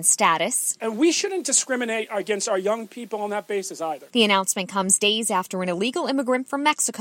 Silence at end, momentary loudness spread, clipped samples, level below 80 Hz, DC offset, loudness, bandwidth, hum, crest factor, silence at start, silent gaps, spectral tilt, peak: 0 s; 10 LU; under 0.1%; -76 dBFS; under 0.1%; -22 LUFS; 16.5 kHz; none; 20 dB; 0 s; none; -2 dB/octave; -4 dBFS